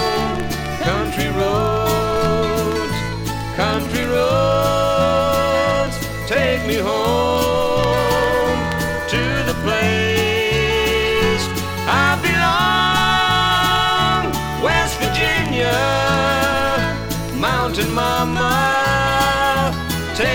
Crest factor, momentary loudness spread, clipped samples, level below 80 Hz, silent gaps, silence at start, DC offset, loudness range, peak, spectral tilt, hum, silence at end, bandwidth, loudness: 16 dB; 6 LU; under 0.1%; -32 dBFS; none; 0 s; under 0.1%; 3 LU; -2 dBFS; -4.5 dB/octave; none; 0 s; 19.5 kHz; -17 LUFS